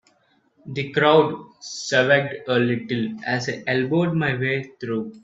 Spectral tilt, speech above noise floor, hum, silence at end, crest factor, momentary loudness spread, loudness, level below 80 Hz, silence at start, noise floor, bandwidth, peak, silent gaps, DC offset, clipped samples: -5.5 dB/octave; 41 dB; none; 0.05 s; 20 dB; 13 LU; -21 LUFS; -62 dBFS; 0.65 s; -63 dBFS; 8 kHz; -2 dBFS; none; under 0.1%; under 0.1%